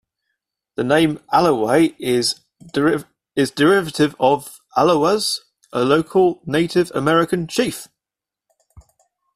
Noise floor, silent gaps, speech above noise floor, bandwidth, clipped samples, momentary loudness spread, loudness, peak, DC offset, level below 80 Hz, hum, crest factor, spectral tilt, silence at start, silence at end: -88 dBFS; none; 70 dB; 15 kHz; under 0.1%; 10 LU; -18 LUFS; -2 dBFS; under 0.1%; -54 dBFS; none; 16 dB; -5 dB/octave; 0.8 s; 0.55 s